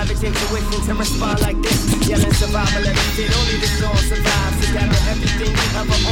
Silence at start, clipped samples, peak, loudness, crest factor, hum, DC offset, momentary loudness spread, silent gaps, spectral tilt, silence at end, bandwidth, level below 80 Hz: 0 s; under 0.1%; -2 dBFS; -18 LUFS; 14 dB; none; under 0.1%; 3 LU; none; -4 dB/octave; 0 s; 17.5 kHz; -20 dBFS